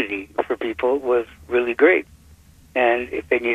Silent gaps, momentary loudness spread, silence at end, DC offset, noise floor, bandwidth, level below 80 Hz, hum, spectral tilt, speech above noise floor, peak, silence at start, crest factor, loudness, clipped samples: none; 9 LU; 0 s; under 0.1%; -49 dBFS; 10 kHz; -52 dBFS; none; -5.5 dB/octave; 29 dB; -4 dBFS; 0 s; 18 dB; -21 LUFS; under 0.1%